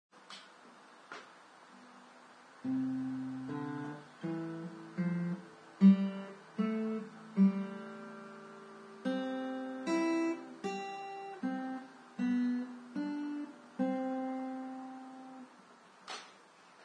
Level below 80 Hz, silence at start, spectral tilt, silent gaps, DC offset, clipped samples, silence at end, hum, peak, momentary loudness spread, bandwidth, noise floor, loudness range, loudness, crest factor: -88 dBFS; 0.15 s; -7.5 dB/octave; none; under 0.1%; under 0.1%; 0 s; none; -14 dBFS; 24 LU; 9.6 kHz; -60 dBFS; 9 LU; -36 LUFS; 22 dB